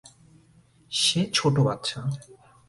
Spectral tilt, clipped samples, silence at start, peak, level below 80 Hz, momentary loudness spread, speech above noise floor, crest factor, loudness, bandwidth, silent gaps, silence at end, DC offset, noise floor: -4 dB/octave; under 0.1%; 0.9 s; -8 dBFS; -58 dBFS; 11 LU; 33 dB; 20 dB; -24 LUFS; 11.5 kHz; none; 0.35 s; under 0.1%; -58 dBFS